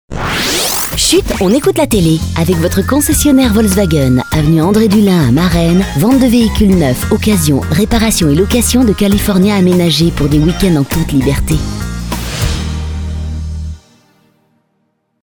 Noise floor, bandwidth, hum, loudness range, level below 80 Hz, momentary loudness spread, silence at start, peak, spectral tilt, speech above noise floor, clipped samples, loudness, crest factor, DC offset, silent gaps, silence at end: -62 dBFS; over 20 kHz; none; 7 LU; -22 dBFS; 11 LU; 0.1 s; 0 dBFS; -5 dB/octave; 52 dB; under 0.1%; -11 LUFS; 10 dB; under 0.1%; none; 1.45 s